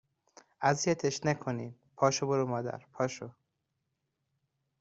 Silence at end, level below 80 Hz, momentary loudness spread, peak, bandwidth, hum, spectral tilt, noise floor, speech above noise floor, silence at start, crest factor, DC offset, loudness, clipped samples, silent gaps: 1.5 s; -72 dBFS; 12 LU; -12 dBFS; 8 kHz; none; -4.5 dB/octave; -83 dBFS; 51 dB; 0.6 s; 22 dB; under 0.1%; -32 LUFS; under 0.1%; none